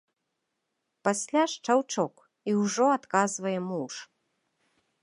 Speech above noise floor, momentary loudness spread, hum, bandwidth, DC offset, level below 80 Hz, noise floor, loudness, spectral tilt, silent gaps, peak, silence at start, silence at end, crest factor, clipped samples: 54 dB; 10 LU; none; 11.5 kHz; under 0.1%; -82 dBFS; -81 dBFS; -28 LUFS; -4 dB/octave; none; -8 dBFS; 1.05 s; 1 s; 20 dB; under 0.1%